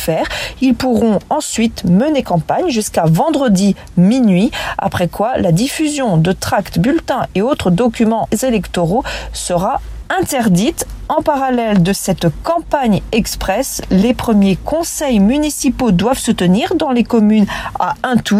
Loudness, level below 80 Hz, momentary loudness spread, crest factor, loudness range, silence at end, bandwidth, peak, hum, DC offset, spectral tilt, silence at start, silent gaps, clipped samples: -14 LUFS; -34 dBFS; 5 LU; 14 dB; 2 LU; 0 s; 15.5 kHz; 0 dBFS; none; under 0.1%; -5.5 dB/octave; 0 s; none; under 0.1%